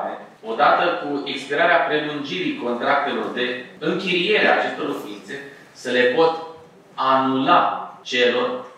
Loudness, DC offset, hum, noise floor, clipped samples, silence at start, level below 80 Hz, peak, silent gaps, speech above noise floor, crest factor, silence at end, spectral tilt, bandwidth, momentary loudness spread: -20 LUFS; under 0.1%; none; -43 dBFS; under 0.1%; 0 s; -78 dBFS; -2 dBFS; none; 23 dB; 18 dB; 0.05 s; -4.5 dB/octave; 13.5 kHz; 16 LU